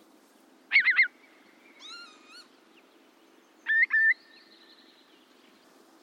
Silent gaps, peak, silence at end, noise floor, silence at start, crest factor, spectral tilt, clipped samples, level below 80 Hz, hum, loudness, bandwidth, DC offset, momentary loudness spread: none; -12 dBFS; 1.9 s; -60 dBFS; 0.7 s; 20 dB; 0.5 dB/octave; under 0.1%; under -90 dBFS; none; -23 LUFS; 12 kHz; under 0.1%; 24 LU